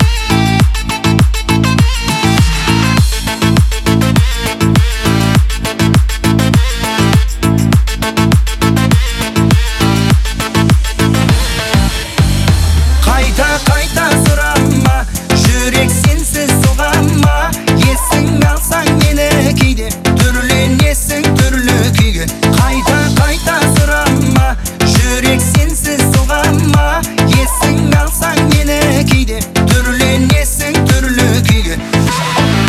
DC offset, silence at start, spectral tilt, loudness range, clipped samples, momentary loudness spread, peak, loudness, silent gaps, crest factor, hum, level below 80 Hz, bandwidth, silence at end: under 0.1%; 0 s; -5 dB/octave; 1 LU; under 0.1%; 3 LU; 0 dBFS; -11 LUFS; none; 10 dB; none; -16 dBFS; 16 kHz; 0 s